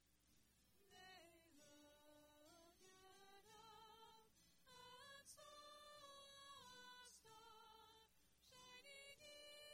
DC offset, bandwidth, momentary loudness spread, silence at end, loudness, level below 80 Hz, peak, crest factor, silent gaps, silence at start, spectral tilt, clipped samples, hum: under 0.1%; 16 kHz; 8 LU; 0 s; -64 LUFS; -88 dBFS; -50 dBFS; 16 dB; none; 0 s; -1.5 dB/octave; under 0.1%; none